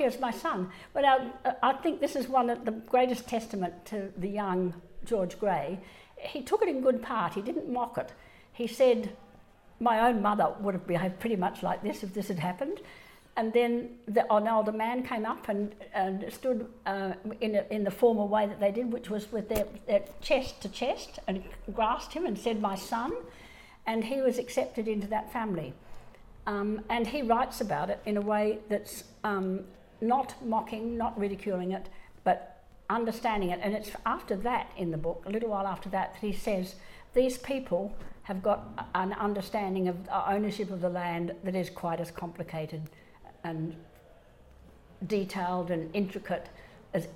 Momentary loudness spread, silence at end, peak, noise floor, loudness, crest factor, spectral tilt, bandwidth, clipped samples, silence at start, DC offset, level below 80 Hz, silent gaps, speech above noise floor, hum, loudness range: 11 LU; 0 s; -12 dBFS; -56 dBFS; -31 LUFS; 20 dB; -6 dB/octave; 16.5 kHz; under 0.1%; 0 s; under 0.1%; -54 dBFS; none; 26 dB; none; 4 LU